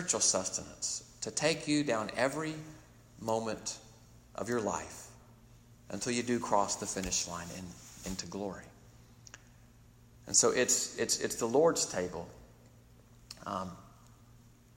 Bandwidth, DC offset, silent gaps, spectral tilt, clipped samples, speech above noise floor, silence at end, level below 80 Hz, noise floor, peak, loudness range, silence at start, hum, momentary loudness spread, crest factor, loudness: 16 kHz; under 0.1%; none; -2.5 dB/octave; under 0.1%; 26 dB; 0.4 s; -62 dBFS; -59 dBFS; -12 dBFS; 9 LU; 0 s; none; 21 LU; 24 dB; -32 LUFS